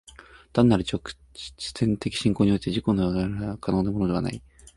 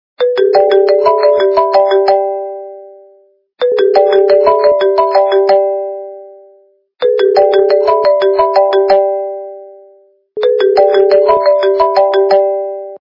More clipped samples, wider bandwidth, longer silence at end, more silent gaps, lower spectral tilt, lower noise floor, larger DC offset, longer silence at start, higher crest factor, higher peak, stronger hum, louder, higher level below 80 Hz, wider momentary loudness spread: neither; first, 11.5 kHz vs 5.8 kHz; first, 0.4 s vs 0.15 s; neither; about the same, -6.5 dB/octave vs -5.5 dB/octave; about the same, -50 dBFS vs -49 dBFS; neither; about the same, 0.2 s vs 0.2 s; first, 20 dB vs 10 dB; second, -6 dBFS vs 0 dBFS; neither; second, -25 LUFS vs -10 LUFS; first, -44 dBFS vs -54 dBFS; about the same, 13 LU vs 13 LU